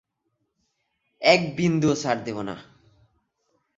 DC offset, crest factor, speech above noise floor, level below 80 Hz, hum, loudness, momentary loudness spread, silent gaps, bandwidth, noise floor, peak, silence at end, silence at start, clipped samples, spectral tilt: under 0.1%; 24 dB; 54 dB; -60 dBFS; none; -23 LUFS; 15 LU; none; 8 kHz; -76 dBFS; -2 dBFS; 1.15 s; 1.2 s; under 0.1%; -5 dB/octave